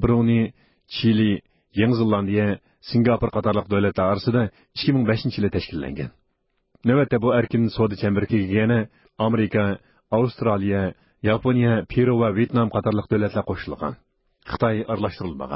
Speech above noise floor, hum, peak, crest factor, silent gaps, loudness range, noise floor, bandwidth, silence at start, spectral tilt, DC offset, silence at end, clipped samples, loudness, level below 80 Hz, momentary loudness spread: 50 dB; none; -6 dBFS; 16 dB; none; 2 LU; -71 dBFS; 5.8 kHz; 0 s; -12 dB/octave; under 0.1%; 0 s; under 0.1%; -22 LUFS; -44 dBFS; 10 LU